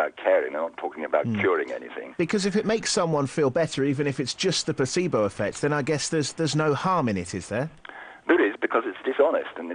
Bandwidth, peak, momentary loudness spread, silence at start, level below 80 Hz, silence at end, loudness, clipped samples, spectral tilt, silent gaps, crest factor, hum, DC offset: 10 kHz; -6 dBFS; 8 LU; 0 s; -60 dBFS; 0 s; -25 LUFS; under 0.1%; -4.5 dB/octave; none; 18 dB; none; under 0.1%